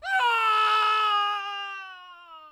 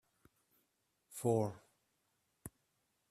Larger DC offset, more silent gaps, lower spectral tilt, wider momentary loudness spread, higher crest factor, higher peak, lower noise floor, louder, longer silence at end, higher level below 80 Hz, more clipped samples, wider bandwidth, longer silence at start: neither; neither; second, 2 dB/octave vs -7 dB/octave; second, 15 LU vs 20 LU; second, 12 dB vs 22 dB; first, -14 dBFS vs -20 dBFS; second, -47 dBFS vs -82 dBFS; first, -23 LUFS vs -38 LUFS; second, 0 s vs 0.65 s; about the same, -78 dBFS vs -76 dBFS; neither; second, 13.5 kHz vs 15.5 kHz; second, 0 s vs 1.1 s